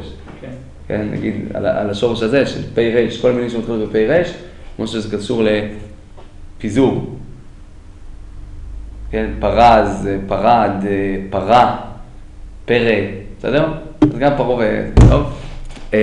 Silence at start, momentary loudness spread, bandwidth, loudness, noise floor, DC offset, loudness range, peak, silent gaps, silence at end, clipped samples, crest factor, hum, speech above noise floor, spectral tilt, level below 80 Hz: 0 s; 22 LU; 10.5 kHz; -16 LUFS; -36 dBFS; under 0.1%; 6 LU; 0 dBFS; none; 0 s; under 0.1%; 16 dB; none; 21 dB; -7 dB/octave; -26 dBFS